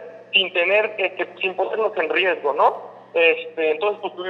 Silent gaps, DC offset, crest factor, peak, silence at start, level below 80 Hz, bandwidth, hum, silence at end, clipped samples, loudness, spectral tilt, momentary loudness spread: none; under 0.1%; 18 dB; -4 dBFS; 0 s; under -90 dBFS; 5.8 kHz; none; 0 s; under 0.1%; -20 LUFS; -4.5 dB/octave; 7 LU